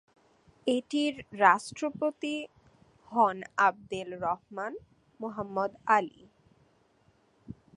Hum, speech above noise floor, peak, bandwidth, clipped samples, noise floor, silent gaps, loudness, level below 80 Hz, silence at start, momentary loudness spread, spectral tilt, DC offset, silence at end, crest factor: none; 37 dB; -6 dBFS; 11.5 kHz; under 0.1%; -67 dBFS; none; -30 LUFS; -70 dBFS; 0.65 s; 16 LU; -4.5 dB/octave; under 0.1%; 0.25 s; 26 dB